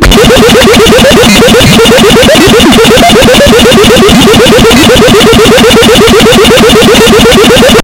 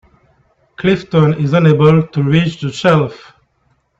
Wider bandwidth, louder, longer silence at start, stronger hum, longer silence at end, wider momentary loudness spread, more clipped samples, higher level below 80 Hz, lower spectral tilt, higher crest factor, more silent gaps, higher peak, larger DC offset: first, over 20 kHz vs 7.8 kHz; first, -1 LUFS vs -13 LUFS; second, 0 s vs 0.8 s; neither; second, 0 s vs 0.85 s; second, 0 LU vs 8 LU; first, 40% vs under 0.1%; first, -16 dBFS vs -46 dBFS; second, -4 dB/octave vs -7.5 dB/octave; second, 0 dB vs 14 dB; neither; about the same, 0 dBFS vs 0 dBFS; first, 1% vs under 0.1%